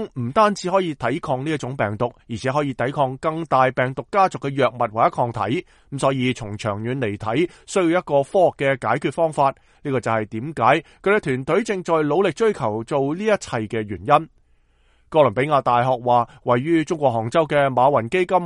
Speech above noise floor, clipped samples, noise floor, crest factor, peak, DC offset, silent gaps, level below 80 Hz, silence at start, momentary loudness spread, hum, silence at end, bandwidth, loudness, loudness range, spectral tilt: 38 dB; under 0.1%; -58 dBFS; 20 dB; -2 dBFS; under 0.1%; none; -54 dBFS; 0 s; 7 LU; none; 0 s; 11.5 kHz; -21 LUFS; 3 LU; -6 dB/octave